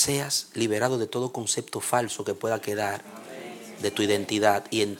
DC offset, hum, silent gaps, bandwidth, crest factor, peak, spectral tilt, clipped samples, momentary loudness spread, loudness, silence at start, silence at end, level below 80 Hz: under 0.1%; none; none; 17.5 kHz; 20 dB; -6 dBFS; -3.5 dB/octave; under 0.1%; 15 LU; -27 LUFS; 0 s; 0 s; -66 dBFS